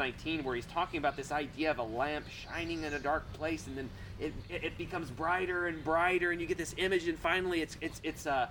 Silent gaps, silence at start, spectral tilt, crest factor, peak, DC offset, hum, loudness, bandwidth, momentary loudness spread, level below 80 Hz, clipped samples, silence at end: none; 0 s; -4.5 dB/octave; 20 dB; -16 dBFS; under 0.1%; none; -35 LUFS; 19 kHz; 9 LU; -52 dBFS; under 0.1%; 0 s